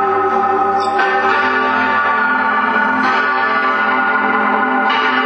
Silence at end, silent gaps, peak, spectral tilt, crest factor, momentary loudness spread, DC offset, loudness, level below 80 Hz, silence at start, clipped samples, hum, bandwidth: 0 s; none; 0 dBFS; -4.5 dB/octave; 14 dB; 1 LU; under 0.1%; -14 LUFS; -62 dBFS; 0 s; under 0.1%; none; 8.6 kHz